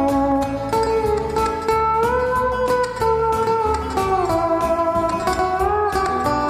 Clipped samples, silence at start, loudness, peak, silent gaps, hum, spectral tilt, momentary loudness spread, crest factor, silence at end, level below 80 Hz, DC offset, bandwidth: under 0.1%; 0 s; -19 LUFS; -4 dBFS; none; none; -5.5 dB/octave; 3 LU; 14 dB; 0 s; -36 dBFS; under 0.1%; 15.5 kHz